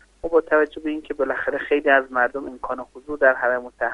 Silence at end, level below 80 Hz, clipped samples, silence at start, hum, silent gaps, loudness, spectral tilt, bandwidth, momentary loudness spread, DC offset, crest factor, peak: 0 s; -52 dBFS; under 0.1%; 0.25 s; none; none; -21 LUFS; -5.5 dB/octave; 9.4 kHz; 13 LU; under 0.1%; 18 dB; -2 dBFS